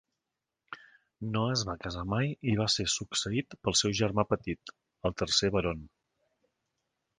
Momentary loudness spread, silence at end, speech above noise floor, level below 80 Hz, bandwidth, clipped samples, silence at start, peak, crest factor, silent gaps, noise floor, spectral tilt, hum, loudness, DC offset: 15 LU; 1.3 s; 57 dB; -52 dBFS; 10.5 kHz; under 0.1%; 0.7 s; -10 dBFS; 22 dB; none; -88 dBFS; -4 dB/octave; none; -30 LUFS; under 0.1%